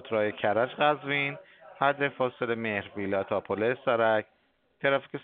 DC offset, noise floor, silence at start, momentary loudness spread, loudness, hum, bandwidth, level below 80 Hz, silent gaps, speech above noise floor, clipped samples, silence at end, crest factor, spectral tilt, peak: under 0.1%; -67 dBFS; 0 s; 6 LU; -28 LUFS; none; 4.5 kHz; -74 dBFS; none; 39 dB; under 0.1%; 0 s; 20 dB; -3 dB/octave; -8 dBFS